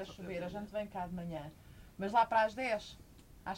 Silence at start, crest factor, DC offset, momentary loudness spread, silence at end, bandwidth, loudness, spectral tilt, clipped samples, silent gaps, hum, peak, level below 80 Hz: 0 s; 20 dB; under 0.1%; 21 LU; 0 s; 16 kHz; -36 LUFS; -5.5 dB/octave; under 0.1%; none; none; -18 dBFS; -60 dBFS